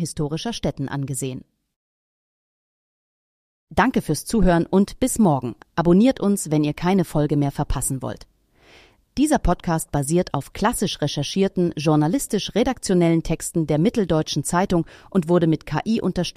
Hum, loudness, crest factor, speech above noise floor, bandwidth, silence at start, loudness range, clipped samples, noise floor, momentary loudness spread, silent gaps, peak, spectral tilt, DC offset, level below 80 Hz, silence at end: none; -21 LUFS; 16 dB; 32 dB; 15.5 kHz; 0 s; 8 LU; under 0.1%; -53 dBFS; 8 LU; 1.76-3.67 s; -4 dBFS; -5.5 dB/octave; under 0.1%; -36 dBFS; 0.05 s